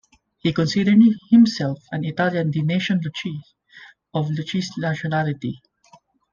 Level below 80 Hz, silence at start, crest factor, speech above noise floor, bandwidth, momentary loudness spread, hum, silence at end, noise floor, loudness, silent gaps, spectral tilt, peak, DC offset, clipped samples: -60 dBFS; 0.45 s; 16 dB; 35 dB; 7.4 kHz; 15 LU; none; 0.75 s; -54 dBFS; -21 LUFS; none; -6.5 dB/octave; -4 dBFS; under 0.1%; under 0.1%